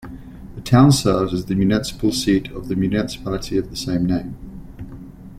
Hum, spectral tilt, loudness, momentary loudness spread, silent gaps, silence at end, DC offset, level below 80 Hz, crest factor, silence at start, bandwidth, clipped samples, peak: none; -6 dB/octave; -19 LUFS; 23 LU; none; 0 s; under 0.1%; -38 dBFS; 18 dB; 0 s; 16 kHz; under 0.1%; -2 dBFS